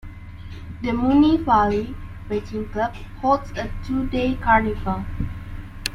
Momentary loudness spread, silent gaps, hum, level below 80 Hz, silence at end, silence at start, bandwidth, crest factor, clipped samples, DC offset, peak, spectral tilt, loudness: 20 LU; none; none; -34 dBFS; 0 s; 0.05 s; 16 kHz; 20 dB; under 0.1%; under 0.1%; -2 dBFS; -6.5 dB/octave; -22 LUFS